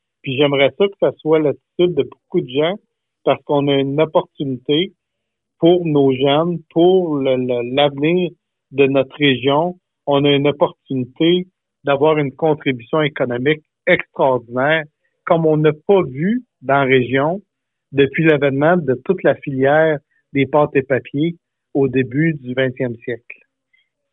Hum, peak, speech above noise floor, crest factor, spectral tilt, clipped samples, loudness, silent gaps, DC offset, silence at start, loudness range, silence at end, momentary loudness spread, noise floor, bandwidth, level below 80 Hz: none; 0 dBFS; 62 dB; 16 dB; -10.5 dB/octave; under 0.1%; -17 LUFS; none; under 0.1%; 0.25 s; 3 LU; 0.8 s; 10 LU; -78 dBFS; 4 kHz; -60 dBFS